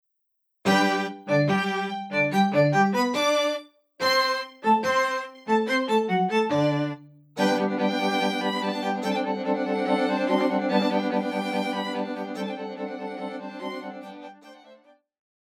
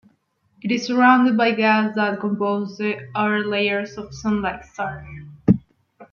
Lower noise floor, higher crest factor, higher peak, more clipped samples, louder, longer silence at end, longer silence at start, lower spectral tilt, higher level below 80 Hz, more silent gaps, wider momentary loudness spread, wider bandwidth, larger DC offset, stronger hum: first, -76 dBFS vs -64 dBFS; about the same, 18 dB vs 18 dB; second, -8 dBFS vs -2 dBFS; neither; second, -25 LUFS vs -20 LUFS; first, 0.75 s vs 0.1 s; about the same, 0.65 s vs 0.65 s; second, -5 dB/octave vs -6.5 dB/octave; second, -78 dBFS vs -52 dBFS; neither; about the same, 13 LU vs 14 LU; first, 16 kHz vs 7 kHz; neither; neither